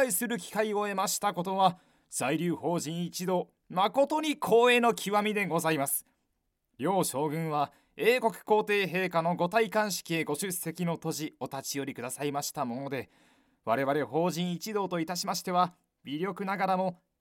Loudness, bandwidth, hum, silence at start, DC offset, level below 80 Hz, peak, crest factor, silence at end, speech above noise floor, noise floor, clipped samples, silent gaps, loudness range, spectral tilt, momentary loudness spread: -30 LUFS; 17 kHz; none; 0 s; under 0.1%; -76 dBFS; -10 dBFS; 20 dB; 0.25 s; 50 dB; -79 dBFS; under 0.1%; none; 6 LU; -4 dB/octave; 9 LU